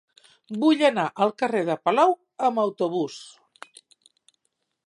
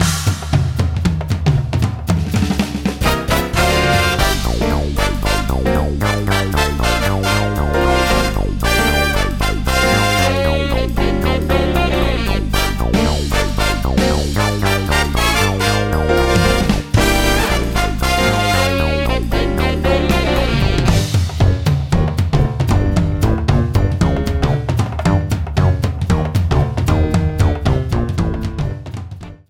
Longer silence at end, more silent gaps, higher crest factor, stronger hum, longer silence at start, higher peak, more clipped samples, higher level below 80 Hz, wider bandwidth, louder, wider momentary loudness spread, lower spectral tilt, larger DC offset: first, 1.55 s vs 0.15 s; neither; about the same, 18 dB vs 14 dB; neither; first, 0.5 s vs 0 s; second, -6 dBFS vs -2 dBFS; neither; second, -80 dBFS vs -22 dBFS; second, 11 kHz vs 17 kHz; second, -23 LUFS vs -16 LUFS; first, 10 LU vs 4 LU; about the same, -5.5 dB/octave vs -5.5 dB/octave; neither